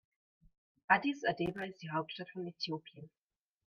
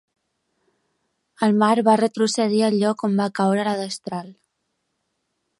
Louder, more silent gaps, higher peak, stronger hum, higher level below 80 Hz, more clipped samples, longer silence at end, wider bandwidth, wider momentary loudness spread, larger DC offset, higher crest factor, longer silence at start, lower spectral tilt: second, -36 LUFS vs -20 LUFS; neither; second, -14 dBFS vs -4 dBFS; neither; about the same, -74 dBFS vs -74 dBFS; neither; second, 0.6 s vs 1.3 s; second, 7.2 kHz vs 11.5 kHz; first, 14 LU vs 11 LU; neither; first, 26 dB vs 18 dB; second, 0.9 s vs 1.4 s; about the same, -5.5 dB/octave vs -5.5 dB/octave